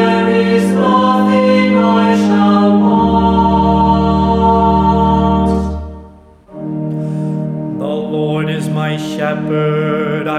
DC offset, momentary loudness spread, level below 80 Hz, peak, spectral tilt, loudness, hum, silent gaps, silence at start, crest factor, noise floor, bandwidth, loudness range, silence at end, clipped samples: under 0.1%; 9 LU; -28 dBFS; 0 dBFS; -7.5 dB/octave; -13 LUFS; none; none; 0 s; 12 dB; -39 dBFS; 11 kHz; 8 LU; 0 s; under 0.1%